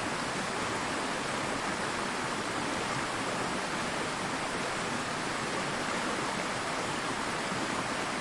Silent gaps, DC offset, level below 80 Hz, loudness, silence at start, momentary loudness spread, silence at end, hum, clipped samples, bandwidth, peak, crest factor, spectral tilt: none; under 0.1%; -58 dBFS; -32 LUFS; 0 s; 1 LU; 0 s; none; under 0.1%; 11.5 kHz; -18 dBFS; 16 dB; -3 dB/octave